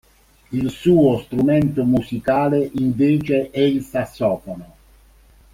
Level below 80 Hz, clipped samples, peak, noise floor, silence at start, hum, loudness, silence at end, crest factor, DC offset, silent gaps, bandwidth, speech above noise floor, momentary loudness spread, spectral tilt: -48 dBFS; under 0.1%; -2 dBFS; -50 dBFS; 0.5 s; none; -19 LUFS; 0.9 s; 16 dB; under 0.1%; none; 16 kHz; 32 dB; 10 LU; -8 dB/octave